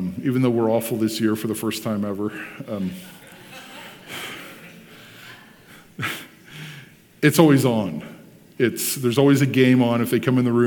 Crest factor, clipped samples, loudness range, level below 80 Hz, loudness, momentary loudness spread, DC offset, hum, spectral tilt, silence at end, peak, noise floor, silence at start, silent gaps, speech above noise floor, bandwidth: 22 dB; under 0.1%; 16 LU; -64 dBFS; -21 LUFS; 24 LU; under 0.1%; none; -5.5 dB/octave; 0 s; 0 dBFS; -48 dBFS; 0 s; none; 28 dB; 19 kHz